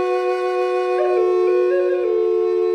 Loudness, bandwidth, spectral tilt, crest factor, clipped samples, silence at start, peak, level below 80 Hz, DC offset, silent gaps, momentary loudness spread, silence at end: -18 LUFS; 6.6 kHz; -4.5 dB/octave; 10 dB; under 0.1%; 0 s; -8 dBFS; -68 dBFS; under 0.1%; none; 3 LU; 0 s